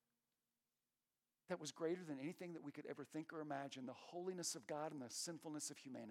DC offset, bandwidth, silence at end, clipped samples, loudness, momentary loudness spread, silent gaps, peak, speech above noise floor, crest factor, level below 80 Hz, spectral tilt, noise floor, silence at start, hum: under 0.1%; 16 kHz; 0 s; under 0.1%; -50 LUFS; 7 LU; none; -32 dBFS; over 40 dB; 20 dB; under -90 dBFS; -3.5 dB/octave; under -90 dBFS; 1.5 s; none